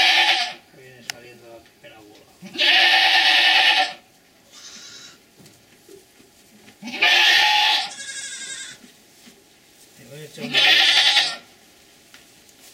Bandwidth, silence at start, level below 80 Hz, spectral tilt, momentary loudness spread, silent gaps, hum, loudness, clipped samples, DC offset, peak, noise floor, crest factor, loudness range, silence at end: 16 kHz; 0 s; -72 dBFS; 0.5 dB/octave; 23 LU; none; none; -15 LUFS; under 0.1%; under 0.1%; -2 dBFS; -54 dBFS; 20 dB; 6 LU; 1.35 s